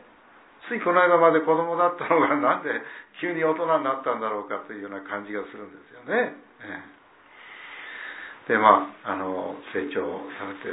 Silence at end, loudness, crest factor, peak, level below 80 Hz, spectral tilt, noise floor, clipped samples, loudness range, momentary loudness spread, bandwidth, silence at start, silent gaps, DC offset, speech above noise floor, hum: 0 s; -24 LUFS; 24 dB; -2 dBFS; -76 dBFS; -9 dB/octave; -53 dBFS; under 0.1%; 11 LU; 21 LU; 4 kHz; 0.65 s; none; under 0.1%; 29 dB; none